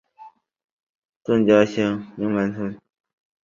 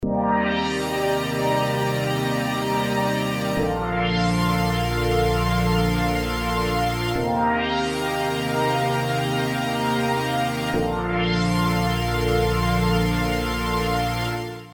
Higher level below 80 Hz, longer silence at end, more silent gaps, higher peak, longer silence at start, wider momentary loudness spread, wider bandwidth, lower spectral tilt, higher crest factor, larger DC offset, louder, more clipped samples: second, -60 dBFS vs -34 dBFS; first, 0.7 s vs 0 s; first, 0.72-1.02 s, 1.09-1.20 s vs none; first, -2 dBFS vs -8 dBFS; first, 0.2 s vs 0 s; first, 14 LU vs 3 LU; second, 7.4 kHz vs over 20 kHz; first, -7 dB/octave vs -5.5 dB/octave; first, 20 dB vs 14 dB; neither; about the same, -21 LUFS vs -22 LUFS; neither